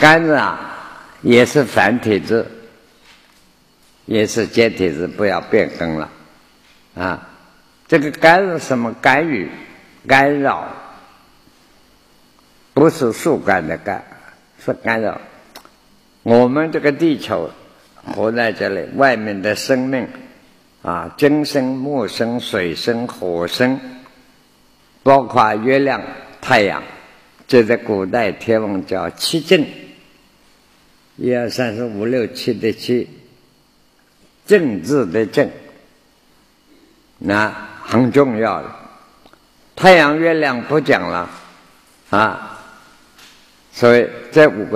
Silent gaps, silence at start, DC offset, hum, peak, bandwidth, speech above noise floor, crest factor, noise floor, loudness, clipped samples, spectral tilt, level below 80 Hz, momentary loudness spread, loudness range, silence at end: none; 0 s; under 0.1%; none; 0 dBFS; 15 kHz; 39 dB; 18 dB; -54 dBFS; -16 LUFS; under 0.1%; -5.5 dB/octave; -54 dBFS; 16 LU; 6 LU; 0 s